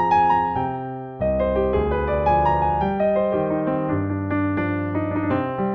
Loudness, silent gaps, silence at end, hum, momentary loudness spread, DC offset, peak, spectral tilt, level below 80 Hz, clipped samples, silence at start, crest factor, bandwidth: -22 LUFS; none; 0 s; none; 6 LU; under 0.1%; -8 dBFS; -9.5 dB/octave; -36 dBFS; under 0.1%; 0 s; 14 dB; 6.4 kHz